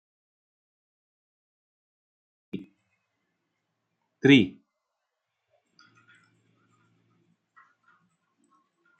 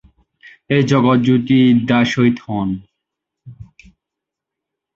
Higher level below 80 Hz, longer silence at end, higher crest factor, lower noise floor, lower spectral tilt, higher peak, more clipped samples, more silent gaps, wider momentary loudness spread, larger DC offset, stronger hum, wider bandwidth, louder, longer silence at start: second, -74 dBFS vs -50 dBFS; first, 4.5 s vs 1.3 s; first, 28 dB vs 16 dB; about the same, -83 dBFS vs -83 dBFS; about the same, -6.5 dB/octave vs -7 dB/octave; about the same, -4 dBFS vs -2 dBFS; neither; neither; first, 23 LU vs 9 LU; neither; neither; first, 8.2 kHz vs 7.4 kHz; second, -21 LUFS vs -15 LUFS; first, 2.55 s vs 0.7 s